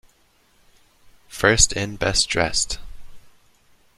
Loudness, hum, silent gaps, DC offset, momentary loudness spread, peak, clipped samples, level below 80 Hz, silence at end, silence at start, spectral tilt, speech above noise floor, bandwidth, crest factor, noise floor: -19 LUFS; none; none; under 0.1%; 13 LU; -2 dBFS; under 0.1%; -36 dBFS; 0.7 s; 1.3 s; -2 dB/octave; 40 dB; 15.5 kHz; 24 dB; -59 dBFS